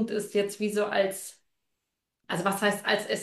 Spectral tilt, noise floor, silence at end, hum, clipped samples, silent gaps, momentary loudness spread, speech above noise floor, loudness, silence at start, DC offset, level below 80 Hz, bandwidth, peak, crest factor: -4 dB/octave; -84 dBFS; 0 s; none; under 0.1%; none; 8 LU; 56 dB; -28 LUFS; 0 s; under 0.1%; -74 dBFS; 12.5 kHz; -10 dBFS; 20 dB